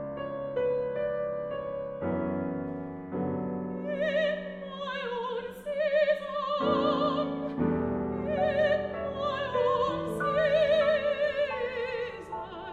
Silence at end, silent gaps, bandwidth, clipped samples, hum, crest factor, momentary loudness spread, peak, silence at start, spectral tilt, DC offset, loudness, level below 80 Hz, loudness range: 0 s; none; 11 kHz; under 0.1%; none; 16 dB; 10 LU; -14 dBFS; 0 s; -7 dB/octave; under 0.1%; -30 LUFS; -56 dBFS; 5 LU